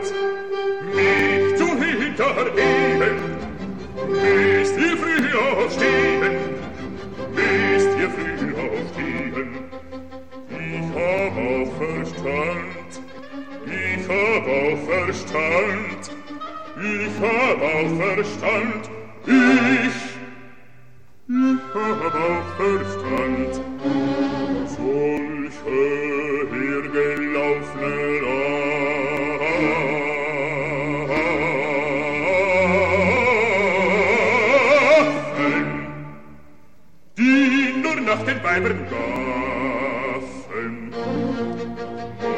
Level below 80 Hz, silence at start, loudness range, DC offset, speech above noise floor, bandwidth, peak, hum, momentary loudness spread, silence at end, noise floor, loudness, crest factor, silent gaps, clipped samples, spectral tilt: -50 dBFS; 0 s; 7 LU; 0.9%; 34 dB; 9.6 kHz; -4 dBFS; none; 14 LU; 0 s; -55 dBFS; -20 LUFS; 18 dB; none; under 0.1%; -5.5 dB/octave